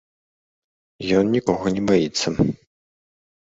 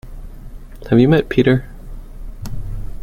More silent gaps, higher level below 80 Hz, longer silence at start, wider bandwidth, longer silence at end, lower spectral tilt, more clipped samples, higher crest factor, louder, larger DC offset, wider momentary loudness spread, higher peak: neither; second, -48 dBFS vs -30 dBFS; first, 1 s vs 0.05 s; second, 8 kHz vs 15.5 kHz; first, 0.95 s vs 0 s; second, -5.5 dB/octave vs -8 dB/octave; neither; about the same, 18 dB vs 16 dB; second, -21 LUFS vs -15 LUFS; neither; second, 6 LU vs 26 LU; about the same, -4 dBFS vs -2 dBFS